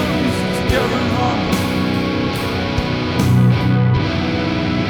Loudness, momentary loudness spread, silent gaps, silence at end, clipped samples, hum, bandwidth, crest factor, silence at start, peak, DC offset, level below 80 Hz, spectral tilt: -17 LUFS; 5 LU; none; 0 s; under 0.1%; none; 19 kHz; 14 dB; 0 s; -2 dBFS; under 0.1%; -32 dBFS; -6.5 dB/octave